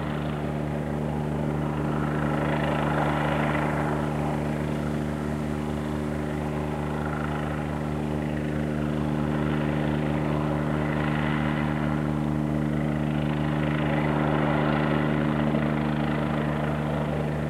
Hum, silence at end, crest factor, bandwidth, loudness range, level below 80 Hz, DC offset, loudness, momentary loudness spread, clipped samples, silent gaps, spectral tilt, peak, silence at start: none; 0 s; 16 dB; 12 kHz; 4 LU; -40 dBFS; under 0.1%; -27 LUFS; 5 LU; under 0.1%; none; -7.5 dB/octave; -10 dBFS; 0 s